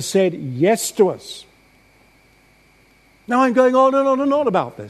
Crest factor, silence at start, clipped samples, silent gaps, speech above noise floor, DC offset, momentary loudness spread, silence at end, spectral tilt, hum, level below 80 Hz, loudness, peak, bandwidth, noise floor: 16 dB; 0 s; under 0.1%; none; 37 dB; under 0.1%; 10 LU; 0 s; -5 dB/octave; none; -62 dBFS; -17 LUFS; -2 dBFS; 13.5 kHz; -54 dBFS